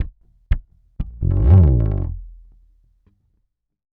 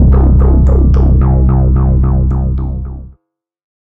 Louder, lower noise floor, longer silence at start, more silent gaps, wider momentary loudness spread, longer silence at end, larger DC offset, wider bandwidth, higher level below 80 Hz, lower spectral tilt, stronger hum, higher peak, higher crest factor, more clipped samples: second, -18 LUFS vs -11 LUFS; first, -69 dBFS vs -60 dBFS; about the same, 0 s vs 0 s; neither; first, 20 LU vs 12 LU; first, 1.65 s vs 0.85 s; neither; first, 3.2 kHz vs 2.1 kHz; second, -24 dBFS vs -10 dBFS; about the same, -12.5 dB/octave vs -12 dB/octave; neither; about the same, 0 dBFS vs 0 dBFS; first, 18 dB vs 8 dB; neither